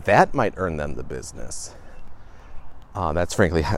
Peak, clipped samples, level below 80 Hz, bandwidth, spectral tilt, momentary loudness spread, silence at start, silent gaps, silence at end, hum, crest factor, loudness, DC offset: -2 dBFS; under 0.1%; -38 dBFS; 14.5 kHz; -5.5 dB/octave; 16 LU; 0 s; none; 0 s; none; 22 dB; -24 LUFS; under 0.1%